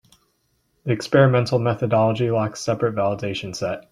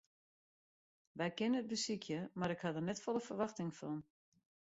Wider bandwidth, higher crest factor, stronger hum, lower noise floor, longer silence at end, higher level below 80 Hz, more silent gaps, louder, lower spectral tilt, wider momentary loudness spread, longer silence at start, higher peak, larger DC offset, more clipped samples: first, 12 kHz vs 8 kHz; about the same, 18 dB vs 16 dB; neither; second, -68 dBFS vs under -90 dBFS; second, 0.1 s vs 0.75 s; first, -56 dBFS vs -78 dBFS; neither; first, -21 LUFS vs -41 LUFS; first, -6.5 dB/octave vs -5 dB/octave; first, 11 LU vs 8 LU; second, 0.85 s vs 1.15 s; first, -4 dBFS vs -26 dBFS; neither; neither